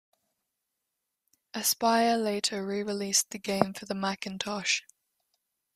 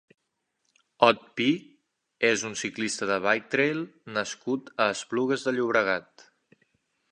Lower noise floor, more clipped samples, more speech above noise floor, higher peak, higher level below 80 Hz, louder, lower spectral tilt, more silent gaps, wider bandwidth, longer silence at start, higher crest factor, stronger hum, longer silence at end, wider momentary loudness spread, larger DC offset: first, -84 dBFS vs -78 dBFS; neither; about the same, 55 dB vs 52 dB; about the same, -4 dBFS vs -2 dBFS; about the same, -72 dBFS vs -74 dBFS; about the same, -28 LUFS vs -26 LUFS; about the same, -2.5 dB/octave vs -3.5 dB/octave; neither; first, 15.5 kHz vs 11.5 kHz; first, 1.55 s vs 1 s; about the same, 26 dB vs 26 dB; neither; second, 0.95 s vs 1.1 s; about the same, 8 LU vs 9 LU; neither